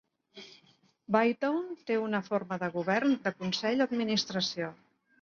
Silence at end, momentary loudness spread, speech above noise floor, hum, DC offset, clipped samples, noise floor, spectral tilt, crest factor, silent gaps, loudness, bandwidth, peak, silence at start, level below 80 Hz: 0.5 s; 12 LU; 36 dB; none; under 0.1%; under 0.1%; -66 dBFS; -5 dB/octave; 20 dB; none; -31 LUFS; 7.2 kHz; -12 dBFS; 0.35 s; -76 dBFS